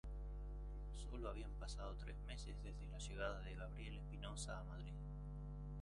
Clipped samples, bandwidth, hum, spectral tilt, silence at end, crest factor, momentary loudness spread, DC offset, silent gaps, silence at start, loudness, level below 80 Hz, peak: under 0.1%; 11 kHz; 50 Hz at -50 dBFS; -5 dB/octave; 0 s; 16 dB; 5 LU; under 0.1%; none; 0.05 s; -51 LUFS; -50 dBFS; -32 dBFS